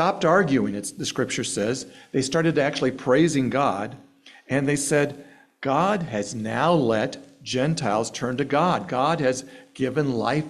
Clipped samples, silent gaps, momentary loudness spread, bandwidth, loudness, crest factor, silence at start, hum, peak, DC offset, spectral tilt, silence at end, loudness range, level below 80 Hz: under 0.1%; none; 9 LU; 13.5 kHz; -23 LUFS; 18 dB; 0 s; none; -6 dBFS; under 0.1%; -5 dB/octave; 0 s; 2 LU; -58 dBFS